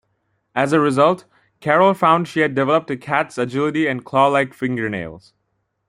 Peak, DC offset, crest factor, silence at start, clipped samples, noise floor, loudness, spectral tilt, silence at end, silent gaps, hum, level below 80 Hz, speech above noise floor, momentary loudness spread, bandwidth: 0 dBFS; under 0.1%; 18 dB; 0.55 s; under 0.1%; -71 dBFS; -18 LUFS; -6.5 dB/octave; 0.7 s; none; none; -60 dBFS; 53 dB; 11 LU; 14 kHz